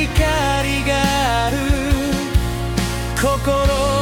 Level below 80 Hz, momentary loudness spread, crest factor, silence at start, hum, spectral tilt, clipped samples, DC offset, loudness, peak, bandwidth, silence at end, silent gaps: -24 dBFS; 4 LU; 14 dB; 0 s; none; -5 dB/octave; under 0.1%; under 0.1%; -18 LUFS; -4 dBFS; 18 kHz; 0 s; none